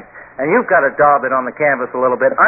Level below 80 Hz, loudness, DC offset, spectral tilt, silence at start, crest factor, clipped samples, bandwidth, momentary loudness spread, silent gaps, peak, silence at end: -54 dBFS; -14 LUFS; under 0.1%; -13 dB/octave; 0 s; 14 dB; under 0.1%; 2.8 kHz; 6 LU; none; 0 dBFS; 0 s